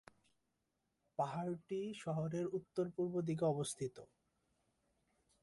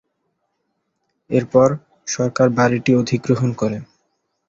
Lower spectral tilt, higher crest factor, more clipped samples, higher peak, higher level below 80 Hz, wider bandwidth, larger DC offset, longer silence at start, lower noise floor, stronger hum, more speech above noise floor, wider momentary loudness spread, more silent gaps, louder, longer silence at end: about the same, -6.5 dB/octave vs -6 dB/octave; about the same, 18 dB vs 18 dB; neither; second, -26 dBFS vs -2 dBFS; second, -78 dBFS vs -54 dBFS; first, 11.5 kHz vs 7.8 kHz; neither; about the same, 1.2 s vs 1.3 s; first, -86 dBFS vs -72 dBFS; neither; second, 46 dB vs 55 dB; about the same, 8 LU vs 10 LU; neither; second, -41 LUFS vs -18 LUFS; first, 1.35 s vs 0.65 s